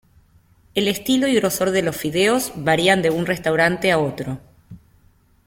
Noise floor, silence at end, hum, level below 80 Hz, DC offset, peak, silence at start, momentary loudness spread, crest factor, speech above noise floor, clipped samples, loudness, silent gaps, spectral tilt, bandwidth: -56 dBFS; 0.7 s; none; -52 dBFS; under 0.1%; -2 dBFS; 0.75 s; 9 LU; 18 dB; 37 dB; under 0.1%; -19 LUFS; none; -4.5 dB/octave; 16.5 kHz